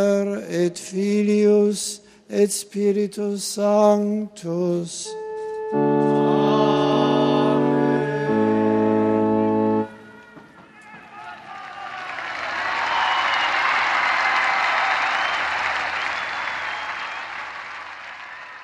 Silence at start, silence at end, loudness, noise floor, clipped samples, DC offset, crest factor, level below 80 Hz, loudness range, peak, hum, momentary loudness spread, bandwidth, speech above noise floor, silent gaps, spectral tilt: 0 s; 0 s; -21 LUFS; -46 dBFS; under 0.1%; under 0.1%; 18 dB; -62 dBFS; 7 LU; -4 dBFS; none; 15 LU; 13.5 kHz; 25 dB; none; -4.5 dB/octave